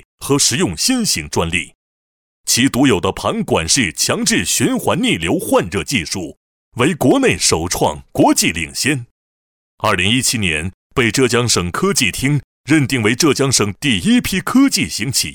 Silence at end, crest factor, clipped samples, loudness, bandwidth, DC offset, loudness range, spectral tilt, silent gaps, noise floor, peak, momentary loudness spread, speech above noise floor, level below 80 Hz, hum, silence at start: 0 s; 14 dB; under 0.1%; -15 LUFS; 19.5 kHz; under 0.1%; 2 LU; -3.5 dB/octave; 1.75-2.44 s, 6.37-6.72 s, 9.11-9.78 s, 10.74-10.90 s, 12.44-12.64 s; under -90 dBFS; -2 dBFS; 6 LU; over 74 dB; -40 dBFS; none; 0.2 s